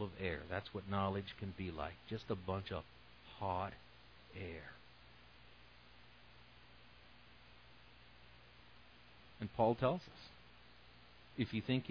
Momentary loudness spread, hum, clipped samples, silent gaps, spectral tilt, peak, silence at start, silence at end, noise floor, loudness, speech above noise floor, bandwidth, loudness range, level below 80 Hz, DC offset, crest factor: 23 LU; 60 Hz at -65 dBFS; under 0.1%; none; -5 dB/octave; -20 dBFS; 0 s; 0 s; -63 dBFS; -42 LUFS; 22 dB; 5.4 kHz; 19 LU; -64 dBFS; under 0.1%; 24 dB